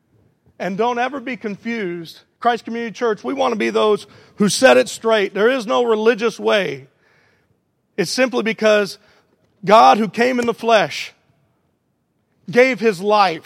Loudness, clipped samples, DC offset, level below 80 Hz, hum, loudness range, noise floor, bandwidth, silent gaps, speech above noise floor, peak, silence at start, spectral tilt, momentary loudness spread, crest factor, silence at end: -17 LUFS; under 0.1%; under 0.1%; -68 dBFS; none; 5 LU; -67 dBFS; 16 kHz; none; 50 dB; 0 dBFS; 0.6 s; -4 dB/octave; 14 LU; 18 dB; 0.05 s